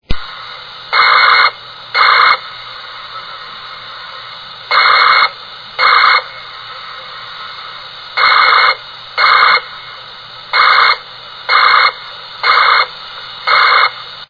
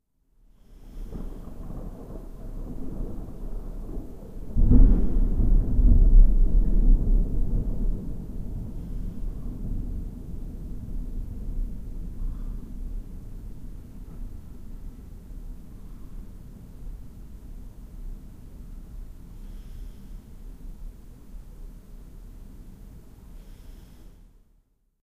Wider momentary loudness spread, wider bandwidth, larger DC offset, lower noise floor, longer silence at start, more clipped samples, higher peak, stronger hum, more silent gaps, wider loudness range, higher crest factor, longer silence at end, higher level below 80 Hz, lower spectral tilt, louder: second, 20 LU vs 24 LU; first, 5.4 kHz vs 1.5 kHz; neither; second, -31 dBFS vs -65 dBFS; second, 0.1 s vs 0.7 s; first, 0.2% vs under 0.1%; first, 0 dBFS vs -4 dBFS; neither; neither; second, 3 LU vs 23 LU; second, 14 dB vs 22 dB; second, 0.05 s vs 0.95 s; second, -40 dBFS vs -26 dBFS; second, -2 dB/octave vs -10 dB/octave; first, -9 LUFS vs -29 LUFS